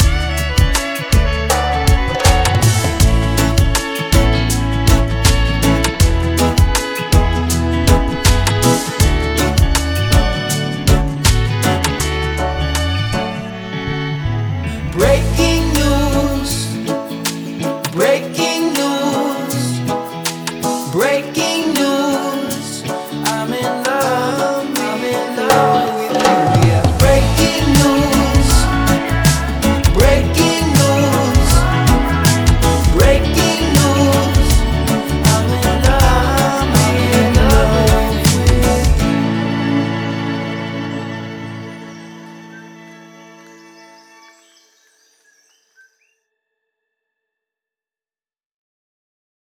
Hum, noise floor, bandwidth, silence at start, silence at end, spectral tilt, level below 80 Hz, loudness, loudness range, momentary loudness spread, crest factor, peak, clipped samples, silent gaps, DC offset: none; under -90 dBFS; over 20 kHz; 0 s; 6.5 s; -5 dB/octave; -20 dBFS; -15 LUFS; 5 LU; 9 LU; 14 dB; 0 dBFS; under 0.1%; none; under 0.1%